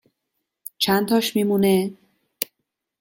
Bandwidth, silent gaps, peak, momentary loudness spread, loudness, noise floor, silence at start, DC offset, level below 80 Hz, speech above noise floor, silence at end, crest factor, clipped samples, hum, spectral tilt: 17 kHz; none; -2 dBFS; 13 LU; -21 LUFS; -79 dBFS; 0.8 s; under 0.1%; -62 dBFS; 60 dB; 0.55 s; 20 dB; under 0.1%; none; -5 dB/octave